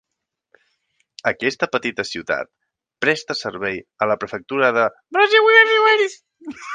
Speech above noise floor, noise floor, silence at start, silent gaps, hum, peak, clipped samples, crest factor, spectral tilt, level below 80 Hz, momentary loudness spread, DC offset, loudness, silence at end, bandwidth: 60 dB; -79 dBFS; 1.25 s; none; none; 0 dBFS; under 0.1%; 20 dB; -3.5 dB/octave; -62 dBFS; 15 LU; under 0.1%; -18 LUFS; 0 s; 9.4 kHz